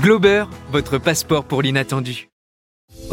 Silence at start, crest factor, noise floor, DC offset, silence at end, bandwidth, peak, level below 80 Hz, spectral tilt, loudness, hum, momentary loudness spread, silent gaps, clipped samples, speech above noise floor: 0 s; 16 dB; under -90 dBFS; under 0.1%; 0 s; 17 kHz; -2 dBFS; -44 dBFS; -5 dB/octave; -18 LUFS; none; 10 LU; 2.32-2.88 s; under 0.1%; over 72 dB